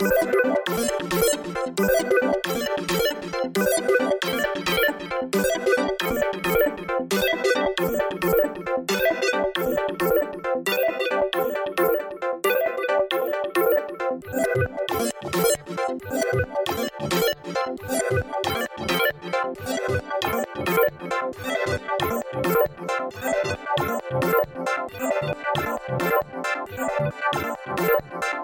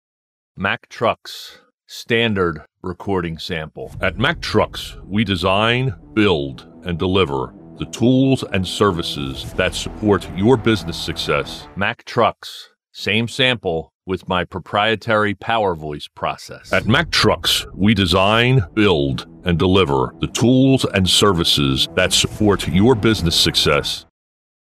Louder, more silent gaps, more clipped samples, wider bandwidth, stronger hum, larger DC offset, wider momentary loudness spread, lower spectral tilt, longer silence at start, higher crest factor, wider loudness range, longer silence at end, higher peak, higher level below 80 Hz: second, -24 LUFS vs -18 LUFS; second, none vs 1.74-1.78 s, 13.95-14.00 s; neither; first, 17 kHz vs 15 kHz; neither; neither; second, 6 LU vs 13 LU; about the same, -4 dB/octave vs -4.5 dB/octave; second, 0 s vs 0.55 s; about the same, 16 dB vs 16 dB; second, 3 LU vs 6 LU; second, 0 s vs 0.6 s; second, -8 dBFS vs -2 dBFS; second, -50 dBFS vs -40 dBFS